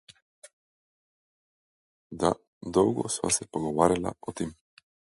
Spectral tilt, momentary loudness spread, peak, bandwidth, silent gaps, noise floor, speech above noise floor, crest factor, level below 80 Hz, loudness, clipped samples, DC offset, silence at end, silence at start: -4.5 dB/octave; 11 LU; -4 dBFS; 11.5 kHz; 2.47-2.61 s; under -90 dBFS; over 63 dB; 26 dB; -56 dBFS; -28 LUFS; under 0.1%; under 0.1%; 0.6 s; 2.1 s